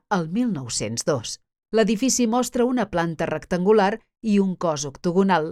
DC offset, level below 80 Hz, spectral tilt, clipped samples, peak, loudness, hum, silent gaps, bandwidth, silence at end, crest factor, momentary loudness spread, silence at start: under 0.1%; -52 dBFS; -5 dB/octave; under 0.1%; -6 dBFS; -22 LUFS; none; none; 14 kHz; 0 s; 16 dB; 7 LU; 0.1 s